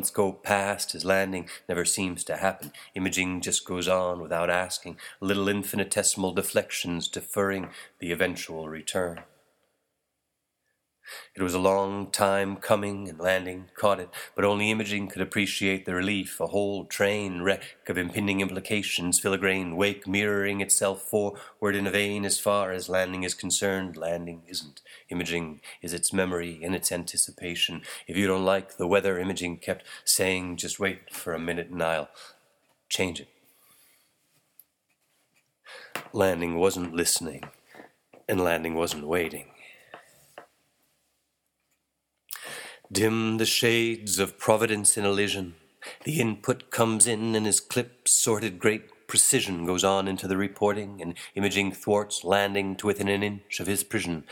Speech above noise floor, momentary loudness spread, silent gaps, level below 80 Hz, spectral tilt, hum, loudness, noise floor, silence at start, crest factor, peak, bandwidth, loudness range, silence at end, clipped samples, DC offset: 53 dB; 12 LU; none; -62 dBFS; -3 dB/octave; none; -26 LUFS; -81 dBFS; 0 s; 24 dB; -4 dBFS; 19 kHz; 9 LU; 0 s; under 0.1%; under 0.1%